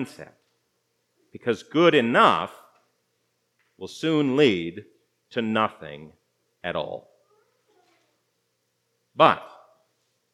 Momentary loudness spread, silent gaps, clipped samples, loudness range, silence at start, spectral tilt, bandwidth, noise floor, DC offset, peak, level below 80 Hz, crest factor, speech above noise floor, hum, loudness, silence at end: 23 LU; none; under 0.1%; 9 LU; 0 s; -5.5 dB/octave; 12.5 kHz; -74 dBFS; under 0.1%; 0 dBFS; -72 dBFS; 26 dB; 51 dB; 60 Hz at -60 dBFS; -22 LUFS; 0.85 s